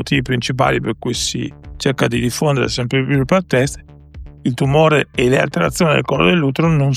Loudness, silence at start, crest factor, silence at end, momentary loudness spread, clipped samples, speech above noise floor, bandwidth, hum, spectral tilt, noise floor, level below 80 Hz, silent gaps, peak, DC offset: -16 LUFS; 0 s; 14 dB; 0 s; 8 LU; under 0.1%; 20 dB; 15 kHz; none; -5.5 dB/octave; -36 dBFS; -38 dBFS; none; -2 dBFS; under 0.1%